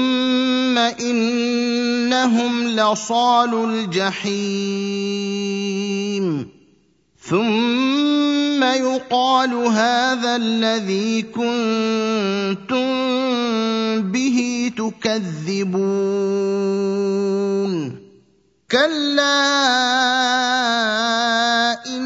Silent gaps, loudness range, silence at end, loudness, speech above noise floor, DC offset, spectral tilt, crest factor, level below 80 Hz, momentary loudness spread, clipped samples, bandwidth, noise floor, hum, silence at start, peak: none; 4 LU; 0 s; -19 LUFS; 40 dB; under 0.1%; -4 dB/octave; 16 dB; -66 dBFS; 7 LU; under 0.1%; 7.8 kHz; -58 dBFS; none; 0 s; -2 dBFS